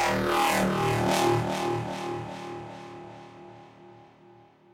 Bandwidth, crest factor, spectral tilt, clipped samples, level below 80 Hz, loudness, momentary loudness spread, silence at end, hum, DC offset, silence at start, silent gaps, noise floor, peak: 16 kHz; 20 dB; -4.5 dB/octave; under 0.1%; -54 dBFS; -27 LUFS; 22 LU; 0.7 s; none; under 0.1%; 0 s; none; -55 dBFS; -8 dBFS